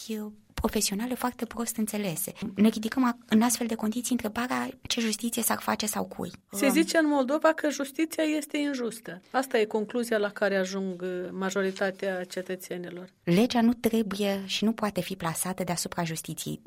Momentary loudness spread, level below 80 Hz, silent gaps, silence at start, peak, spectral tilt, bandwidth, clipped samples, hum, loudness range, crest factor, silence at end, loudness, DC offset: 11 LU; -56 dBFS; none; 0 s; -8 dBFS; -4 dB/octave; 16.5 kHz; under 0.1%; none; 3 LU; 20 dB; 0.1 s; -28 LUFS; under 0.1%